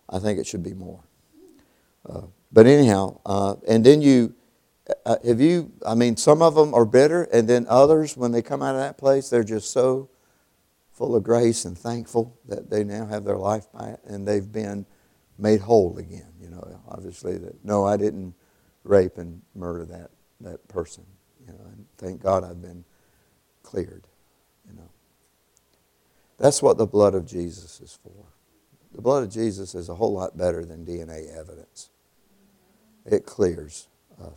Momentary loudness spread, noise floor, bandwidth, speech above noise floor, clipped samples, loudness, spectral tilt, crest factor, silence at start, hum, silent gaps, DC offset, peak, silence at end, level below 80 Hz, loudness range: 23 LU; -65 dBFS; 14 kHz; 44 dB; under 0.1%; -21 LUFS; -6 dB/octave; 22 dB; 0.1 s; none; none; under 0.1%; 0 dBFS; 0.05 s; -56 dBFS; 14 LU